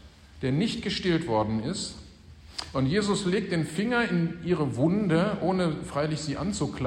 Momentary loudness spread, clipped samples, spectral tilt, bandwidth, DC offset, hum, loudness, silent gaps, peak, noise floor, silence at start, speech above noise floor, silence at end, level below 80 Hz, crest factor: 8 LU; under 0.1%; -6 dB/octave; 11.5 kHz; under 0.1%; none; -27 LUFS; none; -12 dBFS; -49 dBFS; 0.05 s; 22 dB; 0 s; -50 dBFS; 14 dB